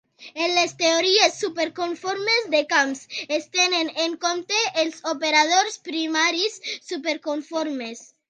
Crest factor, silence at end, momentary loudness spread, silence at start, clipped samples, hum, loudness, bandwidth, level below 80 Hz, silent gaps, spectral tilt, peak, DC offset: 20 dB; 0.25 s; 10 LU; 0.2 s; under 0.1%; none; -22 LUFS; 10.5 kHz; -78 dBFS; none; -0.5 dB/octave; -2 dBFS; under 0.1%